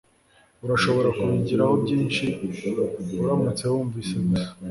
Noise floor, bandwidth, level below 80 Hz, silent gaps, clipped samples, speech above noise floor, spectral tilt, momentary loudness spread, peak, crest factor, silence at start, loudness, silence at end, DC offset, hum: -59 dBFS; 11.5 kHz; -52 dBFS; none; under 0.1%; 36 dB; -6.5 dB/octave; 7 LU; -8 dBFS; 16 dB; 0.65 s; -24 LUFS; 0 s; under 0.1%; none